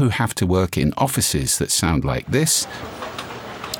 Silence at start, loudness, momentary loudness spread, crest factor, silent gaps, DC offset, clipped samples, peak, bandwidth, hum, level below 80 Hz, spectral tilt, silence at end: 0 s; -19 LUFS; 13 LU; 16 dB; none; under 0.1%; under 0.1%; -4 dBFS; 19 kHz; none; -40 dBFS; -4 dB/octave; 0 s